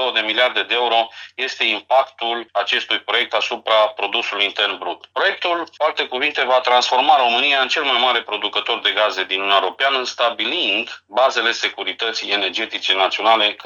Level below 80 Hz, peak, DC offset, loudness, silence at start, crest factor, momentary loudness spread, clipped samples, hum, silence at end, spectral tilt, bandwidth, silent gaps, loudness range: -74 dBFS; 0 dBFS; under 0.1%; -18 LUFS; 0 s; 18 dB; 7 LU; under 0.1%; none; 0 s; -0.5 dB/octave; 11 kHz; none; 3 LU